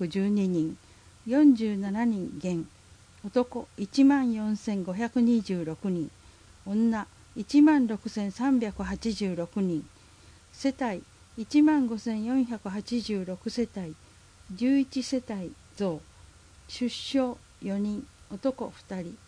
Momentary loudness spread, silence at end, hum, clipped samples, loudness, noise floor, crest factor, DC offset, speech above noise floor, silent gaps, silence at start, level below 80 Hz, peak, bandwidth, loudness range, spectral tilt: 18 LU; 0.1 s; none; under 0.1%; -28 LUFS; -54 dBFS; 16 dB; under 0.1%; 27 dB; none; 0 s; -58 dBFS; -12 dBFS; 10.5 kHz; 6 LU; -6.5 dB/octave